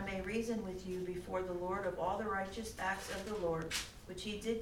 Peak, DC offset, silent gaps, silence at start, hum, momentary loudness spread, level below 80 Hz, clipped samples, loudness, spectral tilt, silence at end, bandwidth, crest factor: -26 dBFS; under 0.1%; none; 0 s; none; 5 LU; -56 dBFS; under 0.1%; -40 LUFS; -4.5 dB/octave; 0 s; 17.5 kHz; 14 dB